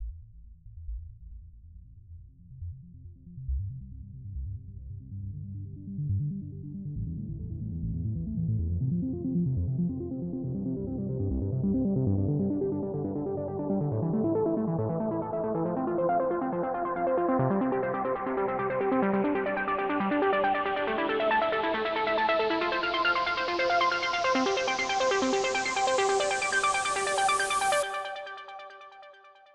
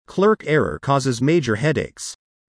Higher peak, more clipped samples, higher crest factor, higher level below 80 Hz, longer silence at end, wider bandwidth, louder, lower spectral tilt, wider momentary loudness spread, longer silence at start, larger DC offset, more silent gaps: second, -14 dBFS vs -6 dBFS; neither; about the same, 16 dB vs 14 dB; about the same, -46 dBFS vs -50 dBFS; about the same, 0.25 s vs 0.35 s; first, 13 kHz vs 10.5 kHz; second, -29 LUFS vs -20 LUFS; about the same, -5 dB/octave vs -6 dB/octave; first, 16 LU vs 11 LU; about the same, 0 s vs 0.1 s; neither; neither